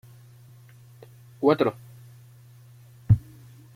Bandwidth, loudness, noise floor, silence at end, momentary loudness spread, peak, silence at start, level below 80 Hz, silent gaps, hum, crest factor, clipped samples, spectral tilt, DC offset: 15 kHz; -24 LUFS; -50 dBFS; 0.55 s; 27 LU; -8 dBFS; 1.4 s; -50 dBFS; none; none; 22 dB; under 0.1%; -9 dB/octave; under 0.1%